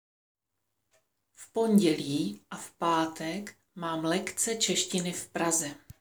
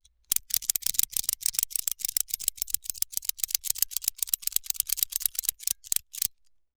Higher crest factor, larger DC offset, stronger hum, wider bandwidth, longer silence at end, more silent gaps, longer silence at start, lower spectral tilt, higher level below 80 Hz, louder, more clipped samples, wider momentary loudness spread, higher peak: second, 18 dB vs 28 dB; neither; neither; about the same, over 20 kHz vs over 20 kHz; second, 0.1 s vs 0.5 s; neither; first, 1.4 s vs 0.3 s; first, -3.5 dB/octave vs 3 dB/octave; second, -72 dBFS vs -58 dBFS; about the same, -29 LUFS vs -27 LUFS; neither; first, 14 LU vs 4 LU; second, -12 dBFS vs -2 dBFS